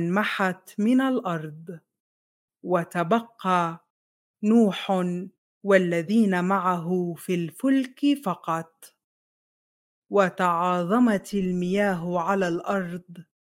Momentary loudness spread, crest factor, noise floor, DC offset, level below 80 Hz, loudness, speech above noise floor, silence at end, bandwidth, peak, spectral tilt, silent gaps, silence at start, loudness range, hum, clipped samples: 12 LU; 20 dB; under -90 dBFS; under 0.1%; -68 dBFS; -24 LUFS; over 66 dB; 0.25 s; 16 kHz; -6 dBFS; -6.5 dB/octave; 2.00-2.48 s, 3.90-4.34 s, 5.38-5.61 s, 9.04-10.02 s; 0 s; 4 LU; none; under 0.1%